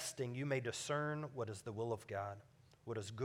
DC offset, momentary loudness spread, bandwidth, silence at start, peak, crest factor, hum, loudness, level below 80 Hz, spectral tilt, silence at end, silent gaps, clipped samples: under 0.1%; 8 LU; 17 kHz; 0 s; -26 dBFS; 16 dB; none; -43 LUFS; -80 dBFS; -5 dB/octave; 0 s; none; under 0.1%